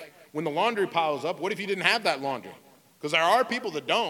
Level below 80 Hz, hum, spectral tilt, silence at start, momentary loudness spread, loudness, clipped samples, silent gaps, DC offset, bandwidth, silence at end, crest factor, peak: -82 dBFS; none; -3.5 dB/octave; 0 s; 13 LU; -26 LUFS; under 0.1%; none; under 0.1%; 18 kHz; 0 s; 24 dB; -4 dBFS